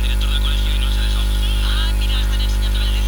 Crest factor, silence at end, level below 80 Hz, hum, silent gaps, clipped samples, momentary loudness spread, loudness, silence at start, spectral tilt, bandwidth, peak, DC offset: 8 dB; 0 s; -16 dBFS; 50 Hz at -15 dBFS; none; under 0.1%; 1 LU; -20 LUFS; 0 s; -4 dB/octave; 19 kHz; -8 dBFS; under 0.1%